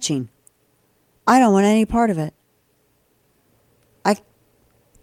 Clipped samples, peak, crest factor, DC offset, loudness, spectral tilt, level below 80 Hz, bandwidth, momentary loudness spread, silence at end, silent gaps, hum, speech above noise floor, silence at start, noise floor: under 0.1%; -2 dBFS; 20 dB; under 0.1%; -18 LUFS; -5.5 dB/octave; -48 dBFS; 16 kHz; 13 LU; 0.85 s; none; none; 47 dB; 0 s; -63 dBFS